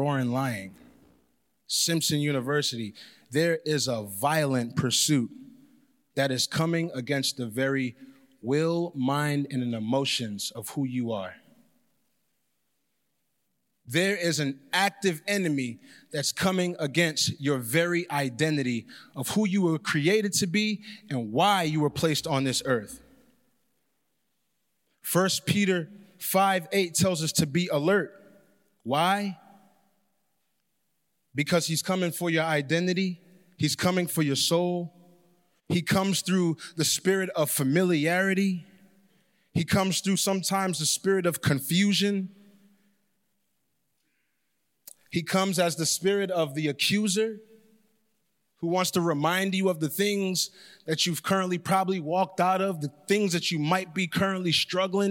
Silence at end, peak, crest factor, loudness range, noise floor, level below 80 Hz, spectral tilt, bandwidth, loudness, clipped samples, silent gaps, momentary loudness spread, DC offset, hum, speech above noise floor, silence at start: 0 s; -10 dBFS; 18 dB; 5 LU; -78 dBFS; -66 dBFS; -4 dB/octave; 17 kHz; -26 LUFS; under 0.1%; none; 9 LU; under 0.1%; none; 52 dB; 0 s